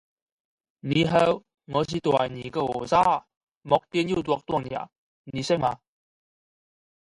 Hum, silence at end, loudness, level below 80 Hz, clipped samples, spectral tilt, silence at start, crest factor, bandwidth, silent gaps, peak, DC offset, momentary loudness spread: none; 1.3 s; -25 LUFS; -58 dBFS; under 0.1%; -6 dB/octave; 0.85 s; 22 dB; 11.5 kHz; 3.37-3.41 s, 3.57-3.61 s, 4.98-5.24 s; -4 dBFS; under 0.1%; 13 LU